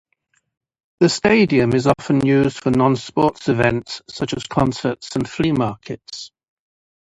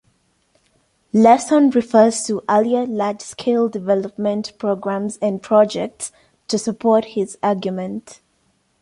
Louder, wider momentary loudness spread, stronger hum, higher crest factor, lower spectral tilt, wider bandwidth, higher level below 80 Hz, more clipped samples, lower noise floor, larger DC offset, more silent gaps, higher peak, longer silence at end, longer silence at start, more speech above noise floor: about the same, -18 LUFS vs -18 LUFS; first, 16 LU vs 11 LU; neither; about the same, 20 dB vs 18 dB; about the same, -6 dB/octave vs -5 dB/octave; about the same, 11 kHz vs 11.5 kHz; first, -46 dBFS vs -62 dBFS; neither; about the same, -67 dBFS vs -64 dBFS; neither; neither; about the same, 0 dBFS vs -2 dBFS; first, 0.85 s vs 0.7 s; second, 1 s vs 1.15 s; about the same, 49 dB vs 46 dB